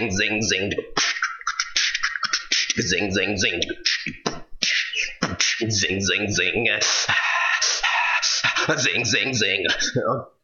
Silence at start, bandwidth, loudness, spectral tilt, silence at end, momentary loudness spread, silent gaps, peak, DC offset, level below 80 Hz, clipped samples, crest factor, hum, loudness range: 0 s; 7.8 kHz; -21 LUFS; -2 dB/octave; 0.15 s; 6 LU; none; 0 dBFS; under 0.1%; -50 dBFS; under 0.1%; 22 dB; none; 3 LU